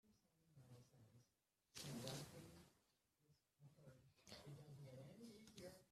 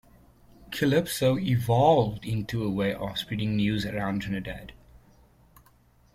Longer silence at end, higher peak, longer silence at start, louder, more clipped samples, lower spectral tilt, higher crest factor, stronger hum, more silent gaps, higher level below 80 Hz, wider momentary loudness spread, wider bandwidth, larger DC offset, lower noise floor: second, 0 s vs 1.15 s; second, -32 dBFS vs -8 dBFS; second, 0.05 s vs 0.6 s; second, -59 LUFS vs -26 LUFS; neither; second, -4.5 dB/octave vs -6 dB/octave; first, 30 dB vs 20 dB; neither; neither; second, -84 dBFS vs -52 dBFS; first, 16 LU vs 11 LU; about the same, 15 kHz vs 16 kHz; neither; first, -88 dBFS vs -60 dBFS